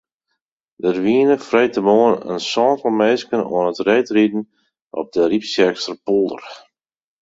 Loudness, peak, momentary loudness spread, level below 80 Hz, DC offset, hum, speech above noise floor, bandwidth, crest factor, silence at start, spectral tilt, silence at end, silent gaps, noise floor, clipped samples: -17 LUFS; -2 dBFS; 11 LU; -60 dBFS; under 0.1%; none; 59 dB; 8 kHz; 16 dB; 0.8 s; -5 dB/octave; 0.65 s; 4.81-4.91 s; -76 dBFS; under 0.1%